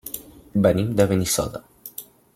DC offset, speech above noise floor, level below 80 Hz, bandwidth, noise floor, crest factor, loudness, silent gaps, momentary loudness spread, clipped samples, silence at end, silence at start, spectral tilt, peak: under 0.1%; 21 dB; -48 dBFS; 16.5 kHz; -41 dBFS; 20 dB; -21 LUFS; none; 18 LU; under 0.1%; 0.3 s; 0.05 s; -5 dB/octave; -4 dBFS